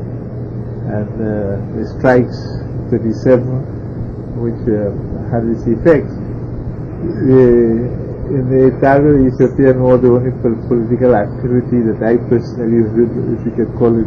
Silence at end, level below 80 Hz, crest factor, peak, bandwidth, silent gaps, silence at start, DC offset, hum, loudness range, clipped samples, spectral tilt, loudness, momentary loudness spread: 0 s; -32 dBFS; 14 dB; 0 dBFS; 6.6 kHz; none; 0 s; under 0.1%; none; 6 LU; under 0.1%; -10.5 dB/octave; -14 LUFS; 14 LU